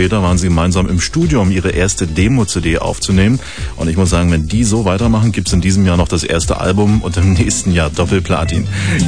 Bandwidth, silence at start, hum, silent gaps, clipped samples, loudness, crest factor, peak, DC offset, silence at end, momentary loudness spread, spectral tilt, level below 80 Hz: 10.5 kHz; 0 s; none; none; under 0.1%; -14 LUFS; 12 dB; 0 dBFS; 2%; 0 s; 3 LU; -5.5 dB/octave; -24 dBFS